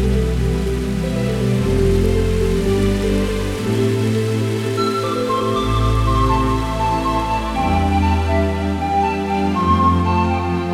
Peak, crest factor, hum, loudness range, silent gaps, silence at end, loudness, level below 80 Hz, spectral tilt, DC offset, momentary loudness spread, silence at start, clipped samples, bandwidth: -2 dBFS; 14 dB; none; 1 LU; none; 0 s; -18 LUFS; -24 dBFS; -6.5 dB/octave; under 0.1%; 4 LU; 0 s; under 0.1%; 15.5 kHz